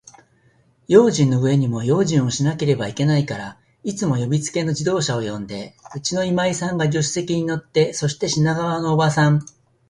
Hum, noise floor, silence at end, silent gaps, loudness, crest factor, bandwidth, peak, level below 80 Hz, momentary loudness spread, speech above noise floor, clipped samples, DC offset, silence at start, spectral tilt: none; -58 dBFS; 0.45 s; none; -20 LUFS; 20 dB; 11.5 kHz; 0 dBFS; -54 dBFS; 11 LU; 39 dB; under 0.1%; under 0.1%; 0.9 s; -5.5 dB/octave